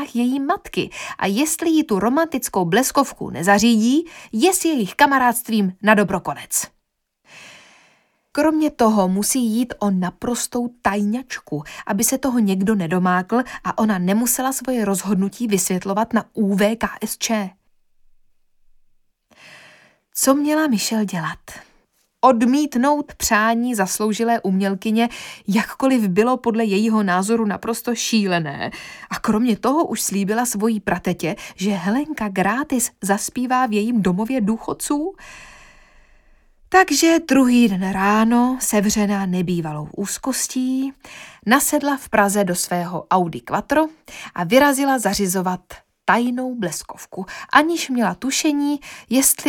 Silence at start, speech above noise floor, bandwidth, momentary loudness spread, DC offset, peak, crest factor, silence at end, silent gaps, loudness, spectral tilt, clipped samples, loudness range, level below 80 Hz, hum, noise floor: 0 s; 52 dB; 19 kHz; 10 LU; under 0.1%; 0 dBFS; 18 dB; 0 s; none; -19 LUFS; -4 dB/octave; under 0.1%; 5 LU; -52 dBFS; none; -71 dBFS